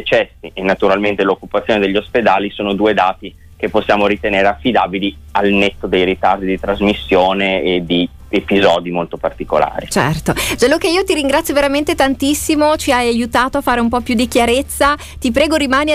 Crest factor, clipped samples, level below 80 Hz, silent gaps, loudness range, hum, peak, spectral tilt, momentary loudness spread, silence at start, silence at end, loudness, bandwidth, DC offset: 12 dB; under 0.1%; -36 dBFS; none; 1 LU; none; -2 dBFS; -4.5 dB/octave; 5 LU; 0 s; 0 s; -15 LUFS; 16 kHz; under 0.1%